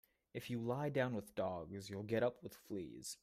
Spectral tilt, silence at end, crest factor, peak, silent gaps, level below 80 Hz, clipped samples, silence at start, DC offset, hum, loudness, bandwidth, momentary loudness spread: -5.5 dB/octave; 0.05 s; 18 dB; -24 dBFS; none; -74 dBFS; under 0.1%; 0.35 s; under 0.1%; none; -42 LUFS; 15.5 kHz; 10 LU